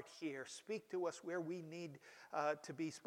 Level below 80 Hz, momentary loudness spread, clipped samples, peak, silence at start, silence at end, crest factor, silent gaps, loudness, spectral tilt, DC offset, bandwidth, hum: under -90 dBFS; 9 LU; under 0.1%; -26 dBFS; 0 s; 0 s; 20 dB; none; -46 LUFS; -5 dB/octave; under 0.1%; 16.5 kHz; none